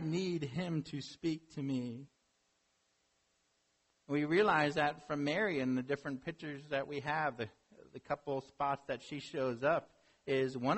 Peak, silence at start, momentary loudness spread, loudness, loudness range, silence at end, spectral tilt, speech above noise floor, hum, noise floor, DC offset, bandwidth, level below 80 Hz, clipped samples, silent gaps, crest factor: -18 dBFS; 0 s; 13 LU; -37 LUFS; 8 LU; 0 s; -6 dB/octave; 42 dB; none; -78 dBFS; under 0.1%; 8.2 kHz; -72 dBFS; under 0.1%; none; 20 dB